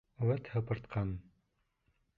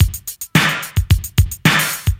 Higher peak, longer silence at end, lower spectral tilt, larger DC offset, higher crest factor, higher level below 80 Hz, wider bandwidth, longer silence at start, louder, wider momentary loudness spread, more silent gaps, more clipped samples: second, -20 dBFS vs 0 dBFS; first, 0.95 s vs 0.05 s; first, -10.5 dB/octave vs -4 dB/octave; neither; about the same, 18 dB vs 16 dB; second, -56 dBFS vs -24 dBFS; second, 4.6 kHz vs 16.5 kHz; first, 0.2 s vs 0 s; second, -37 LUFS vs -16 LUFS; about the same, 6 LU vs 5 LU; neither; neither